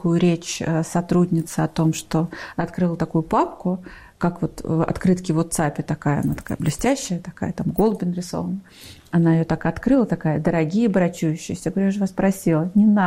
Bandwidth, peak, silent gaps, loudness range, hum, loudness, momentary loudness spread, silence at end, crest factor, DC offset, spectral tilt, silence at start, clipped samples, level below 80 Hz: 15.5 kHz; -8 dBFS; none; 3 LU; none; -22 LUFS; 8 LU; 0 s; 14 dB; under 0.1%; -6.5 dB/octave; 0 s; under 0.1%; -44 dBFS